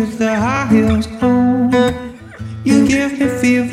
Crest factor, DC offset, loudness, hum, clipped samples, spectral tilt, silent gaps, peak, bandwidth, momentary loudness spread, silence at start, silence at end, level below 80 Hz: 12 dB; under 0.1%; -14 LUFS; none; under 0.1%; -6 dB/octave; none; -2 dBFS; 13.5 kHz; 13 LU; 0 s; 0 s; -36 dBFS